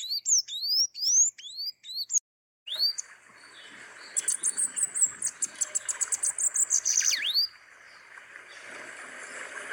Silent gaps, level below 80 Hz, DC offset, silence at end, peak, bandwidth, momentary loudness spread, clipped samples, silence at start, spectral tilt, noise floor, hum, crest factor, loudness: 2.20-2.66 s; -82 dBFS; under 0.1%; 0 s; -14 dBFS; 17 kHz; 22 LU; under 0.1%; 0 s; 4 dB/octave; -52 dBFS; none; 18 dB; -25 LUFS